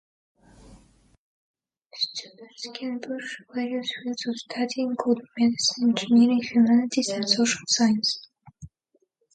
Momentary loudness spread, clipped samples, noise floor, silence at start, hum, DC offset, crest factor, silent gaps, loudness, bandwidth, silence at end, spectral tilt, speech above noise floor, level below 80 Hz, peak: 14 LU; under 0.1%; -70 dBFS; 0.7 s; none; under 0.1%; 20 dB; 1.18-1.54 s, 1.86-1.90 s; -24 LUFS; 9.2 kHz; 0.7 s; -3 dB/octave; 46 dB; -64 dBFS; -6 dBFS